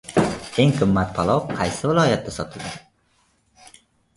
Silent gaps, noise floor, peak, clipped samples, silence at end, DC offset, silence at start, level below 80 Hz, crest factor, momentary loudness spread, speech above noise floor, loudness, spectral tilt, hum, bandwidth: none; -63 dBFS; -2 dBFS; under 0.1%; 1.35 s; under 0.1%; 0.1 s; -46 dBFS; 20 dB; 13 LU; 43 dB; -21 LUFS; -6 dB/octave; none; 11.5 kHz